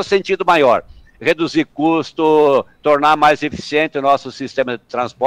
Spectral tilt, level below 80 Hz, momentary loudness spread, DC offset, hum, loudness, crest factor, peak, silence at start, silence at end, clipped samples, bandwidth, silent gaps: -5 dB/octave; -52 dBFS; 9 LU; under 0.1%; none; -16 LUFS; 14 dB; -2 dBFS; 0 s; 0 s; under 0.1%; 12.5 kHz; none